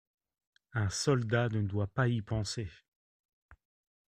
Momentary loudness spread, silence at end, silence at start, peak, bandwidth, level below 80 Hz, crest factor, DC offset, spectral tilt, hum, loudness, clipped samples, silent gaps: 10 LU; 0.6 s; 0.75 s; -16 dBFS; 10.5 kHz; -58 dBFS; 20 dB; under 0.1%; -5.5 dB/octave; none; -33 LUFS; under 0.1%; 2.88-3.49 s